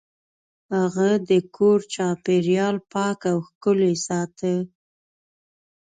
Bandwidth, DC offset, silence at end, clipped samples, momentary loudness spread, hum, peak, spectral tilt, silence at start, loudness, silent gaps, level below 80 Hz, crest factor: 9.4 kHz; under 0.1%; 1.3 s; under 0.1%; 6 LU; none; -8 dBFS; -6 dB/octave; 0.7 s; -22 LUFS; 3.55-3.61 s; -68 dBFS; 14 dB